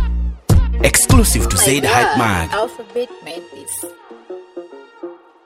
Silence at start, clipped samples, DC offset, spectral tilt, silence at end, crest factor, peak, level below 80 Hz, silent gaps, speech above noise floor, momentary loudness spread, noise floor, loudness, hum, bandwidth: 0 s; under 0.1%; under 0.1%; -4 dB/octave; 0.3 s; 16 dB; 0 dBFS; -22 dBFS; none; 20 dB; 23 LU; -35 dBFS; -15 LUFS; none; 16.5 kHz